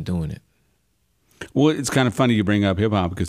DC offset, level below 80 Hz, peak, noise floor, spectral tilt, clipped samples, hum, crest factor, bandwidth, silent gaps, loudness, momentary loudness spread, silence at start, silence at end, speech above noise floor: under 0.1%; -46 dBFS; -6 dBFS; -67 dBFS; -6 dB/octave; under 0.1%; none; 16 dB; 15.5 kHz; none; -20 LUFS; 13 LU; 0 s; 0 s; 47 dB